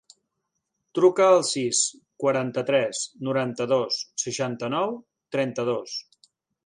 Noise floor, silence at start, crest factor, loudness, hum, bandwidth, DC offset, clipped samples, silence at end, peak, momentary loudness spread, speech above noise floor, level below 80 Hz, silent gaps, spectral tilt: -80 dBFS; 0.95 s; 18 dB; -24 LUFS; none; 11 kHz; under 0.1%; under 0.1%; 0.65 s; -6 dBFS; 11 LU; 56 dB; -74 dBFS; none; -3.5 dB/octave